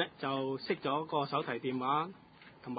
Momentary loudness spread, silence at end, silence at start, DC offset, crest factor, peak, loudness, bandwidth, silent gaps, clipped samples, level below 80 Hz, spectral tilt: 9 LU; 0 s; 0 s; under 0.1%; 18 dB; -18 dBFS; -35 LUFS; 4.9 kHz; none; under 0.1%; -76 dBFS; -3.5 dB/octave